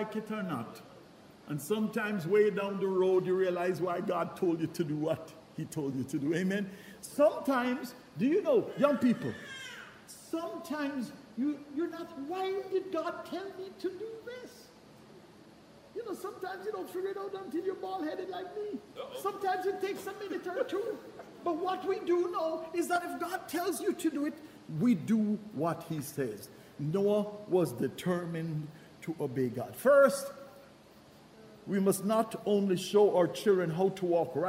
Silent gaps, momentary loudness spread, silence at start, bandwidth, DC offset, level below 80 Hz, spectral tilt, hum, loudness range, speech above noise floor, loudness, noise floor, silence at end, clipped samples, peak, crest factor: none; 15 LU; 0 s; 16 kHz; under 0.1%; -74 dBFS; -6 dB/octave; none; 8 LU; 25 dB; -33 LUFS; -57 dBFS; 0 s; under 0.1%; -12 dBFS; 20 dB